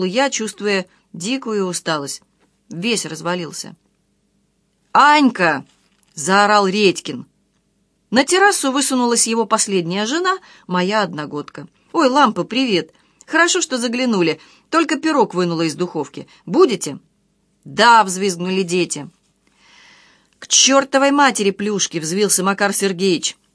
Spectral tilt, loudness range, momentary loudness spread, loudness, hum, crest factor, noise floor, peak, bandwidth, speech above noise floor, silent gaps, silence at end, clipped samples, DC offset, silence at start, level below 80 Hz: -3 dB/octave; 5 LU; 15 LU; -16 LUFS; none; 18 dB; -64 dBFS; 0 dBFS; 11 kHz; 47 dB; none; 0.25 s; under 0.1%; under 0.1%; 0 s; -70 dBFS